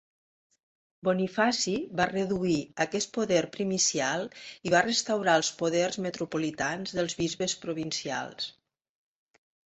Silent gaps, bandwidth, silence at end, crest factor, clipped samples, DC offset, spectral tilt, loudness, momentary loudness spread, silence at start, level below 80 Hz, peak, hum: none; 8.4 kHz; 1.2 s; 20 dB; under 0.1%; under 0.1%; -3.5 dB/octave; -28 LUFS; 8 LU; 1.05 s; -64 dBFS; -10 dBFS; none